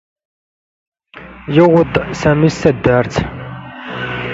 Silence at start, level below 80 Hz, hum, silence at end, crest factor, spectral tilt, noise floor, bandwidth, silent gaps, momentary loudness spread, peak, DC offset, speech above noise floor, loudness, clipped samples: 1.15 s; -38 dBFS; none; 0 s; 16 dB; -7 dB/octave; -37 dBFS; 7.8 kHz; none; 19 LU; 0 dBFS; under 0.1%; 24 dB; -14 LUFS; under 0.1%